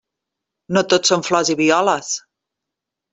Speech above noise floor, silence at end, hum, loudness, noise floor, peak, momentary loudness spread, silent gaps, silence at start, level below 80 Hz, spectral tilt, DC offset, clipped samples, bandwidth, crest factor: 66 dB; 0.95 s; none; -17 LUFS; -83 dBFS; -2 dBFS; 8 LU; none; 0.7 s; -62 dBFS; -3 dB/octave; under 0.1%; under 0.1%; 8.4 kHz; 18 dB